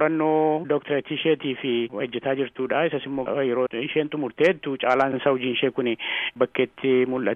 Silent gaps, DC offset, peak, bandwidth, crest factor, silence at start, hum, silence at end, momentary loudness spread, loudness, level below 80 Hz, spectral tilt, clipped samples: none; under 0.1%; -6 dBFS; 7.2 kHz; 18 dB; 0 s; none; 0 s; 5 LU; -24 LUFS; -66 dBFS; -7 dB/octave; under 0.1%